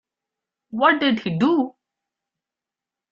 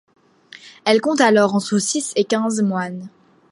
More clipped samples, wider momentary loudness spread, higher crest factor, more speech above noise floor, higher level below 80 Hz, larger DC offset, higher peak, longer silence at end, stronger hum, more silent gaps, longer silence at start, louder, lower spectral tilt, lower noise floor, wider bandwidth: neither; about the same, 11 LU vs 11 LU; about the same, 20 dB vs 18 dB; first, 69 dB vs 28 dB; about the same, -66 dBFS vs -70 dBFS; neither; about the same, -4 dBFS vs -2 dBFS; first, 1.45 s vs 0.45 s; neither; neither; about the same, 0.75 s vs 0.65 s; about the same, -20 LUFS vs -18 LUFS; first, -7 dB/octave vs -4 dB/octave; first, -88 dBFS vs -45 dBFS; second, 7.4 kHz vs 11.5 kHz